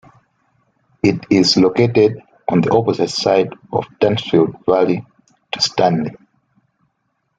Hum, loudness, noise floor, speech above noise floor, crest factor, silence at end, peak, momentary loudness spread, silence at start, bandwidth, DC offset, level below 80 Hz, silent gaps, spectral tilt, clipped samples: none; -16 LUFS; -69 dBFS; 54 dB; 16 dB; 1.25 s; -2 dBFS; 10 LU; 1.05 s; 9.2 kHz; under 0.1%; -54 dBFS; none; -5.5 dB/octave; under 0.1%